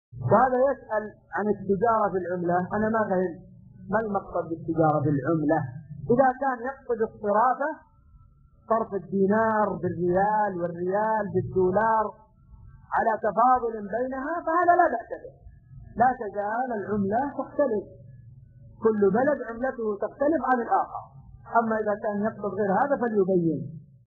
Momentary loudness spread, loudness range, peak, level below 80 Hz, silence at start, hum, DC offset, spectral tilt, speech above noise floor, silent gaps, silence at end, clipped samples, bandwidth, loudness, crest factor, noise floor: 9 LU; 2 LU; -8 dBFS; -56 dBFS; 0.15 s; none; under 0.1%; -11.5 dB/octave; 31 dB; none; 0.25 s; under 0.1%; 6.6 kHz; -25 LUFS; 18 dB; -56 dBFS